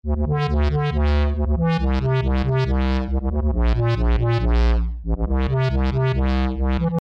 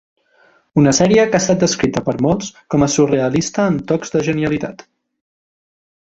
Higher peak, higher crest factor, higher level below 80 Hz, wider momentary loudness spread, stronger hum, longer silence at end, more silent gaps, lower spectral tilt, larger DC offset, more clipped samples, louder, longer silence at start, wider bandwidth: second, -12 dBFS vs -2 dBFS; second, 8 dB vs 16 dB; first, -22 dBFS vs -46 dBFS; second, 3 LU vs 8 LU; neither; second, 0 s vs 1.35 s; neither; first, -8.5 dB/octave vs -5 dB/octave; neither; neither; second, -21 LUFS vs -16 LUFS; second, 0.05 s vs 0.75 s; second, 6 kHz vs 8.2 kHz